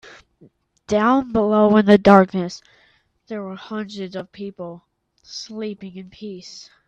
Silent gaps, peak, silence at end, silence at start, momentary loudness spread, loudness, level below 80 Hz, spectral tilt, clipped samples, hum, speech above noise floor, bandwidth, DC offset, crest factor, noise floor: none; 0 dBFS; 0.25 s; 0.9 s; 22 LU; -17 LUFS; -54 dBFS; -7 dB/octave; under 0.1%; none; 40 dB; 7.6 kHz; under 0.1%; 20 dB; -59 dBFS